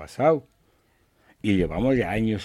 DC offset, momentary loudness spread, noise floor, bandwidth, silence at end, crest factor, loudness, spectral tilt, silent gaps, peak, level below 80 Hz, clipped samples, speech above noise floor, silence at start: under 0.1%; 5 LU; -64 dBFS; 14 kHz; 0 s; 18 dB; -24 LUFS; -7.5 dB/octave; none; -8 dBFS; -44 dBFS; under 0.1%; 41 dB; 0 s